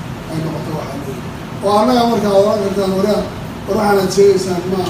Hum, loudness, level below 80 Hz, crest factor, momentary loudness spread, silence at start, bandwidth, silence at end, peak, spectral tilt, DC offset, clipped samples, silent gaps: none; -15 LUFS; -40 dBFS; 14 dB; 13 LU; 0 s; 15.5 kHz; 0 s; 0 dBFS; -6 dB/octave; under 0.1%; under 0.1%; none